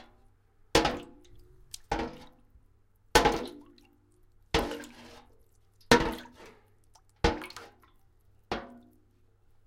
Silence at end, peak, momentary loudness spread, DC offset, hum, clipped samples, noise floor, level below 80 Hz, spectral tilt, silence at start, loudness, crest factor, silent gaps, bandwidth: 0.9 s; -4 dBFS; 26 LU; under 0.1%; none; under 0.1%; -64 dBFS; -46 dBFS; -3.5 dB/octave; 0.75 s; -30 LUFS; 28 dB; none; 16.5 kHz